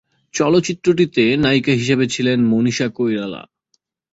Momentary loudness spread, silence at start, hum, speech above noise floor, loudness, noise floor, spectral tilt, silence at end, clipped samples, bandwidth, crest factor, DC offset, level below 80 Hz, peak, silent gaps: 8 LU; 0.35 s; none; 51 dB; -17 LUFS; -67 dBFS; -5.5 dB/octave; 0.7 s; under 0.1%; 8 kHz; 14 dB; under 0.1%; -52 dBFS; -2 dBFS; none